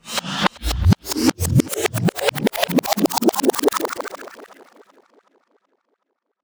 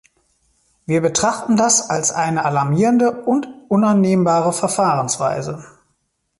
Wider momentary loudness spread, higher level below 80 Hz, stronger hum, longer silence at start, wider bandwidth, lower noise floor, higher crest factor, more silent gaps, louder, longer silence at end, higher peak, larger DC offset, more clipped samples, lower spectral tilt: about the same, 8 LU vs 7 LU; first, -36 dBFS vs -56 dBFS; neither; second, 0.05 s vs 0.9 s; first, over 20 kHz vs 11.5 kHz; first, -74 dBFS vs -69 dBFS; about the same, 20 dB vs 16 dB; neither; second, -20 LUFS vs -17 LUFS; first, 2 s vs 0.7 s; about the same, 0 dBFS vs -2 dBFS; neither; neither; about the same, -4.5 dB/octave vs -4.5 dB/octave